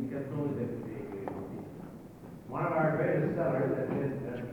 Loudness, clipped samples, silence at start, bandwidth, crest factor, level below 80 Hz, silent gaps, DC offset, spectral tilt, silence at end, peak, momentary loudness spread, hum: -33 LUFS; under 0.1%; 0 s; 19.5 kHz; 16 dB; -64 dBFS; none; under 0.1%; -9.5 dB/octave; 0 s; -18 dBFS; 17 LU; none